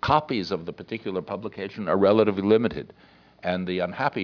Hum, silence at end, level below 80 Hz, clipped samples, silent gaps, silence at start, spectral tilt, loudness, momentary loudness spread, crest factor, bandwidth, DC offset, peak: none; 0 s; -54 dBFS; under 0.1%; none; 0 s; -7.5 dB/octave; -25 LUFS; 14 LU; 20 dB; 5.4 kHz; under 0.1%; -4 dBFS